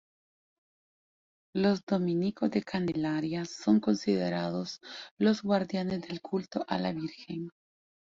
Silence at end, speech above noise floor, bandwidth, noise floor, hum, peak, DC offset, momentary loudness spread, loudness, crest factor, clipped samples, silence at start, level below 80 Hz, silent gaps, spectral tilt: 0.7 s; over 60 dB; 7.6 kHz; under -90 dBFS; none; -14 dBFS; under 0.1%; 12 LU; -31 LUFS; 18 dB; under 0.1%; 1.55 s; -68 dBFS; 1.83-1.87 s, 5.11-5.17 s; -6.5 dB/octave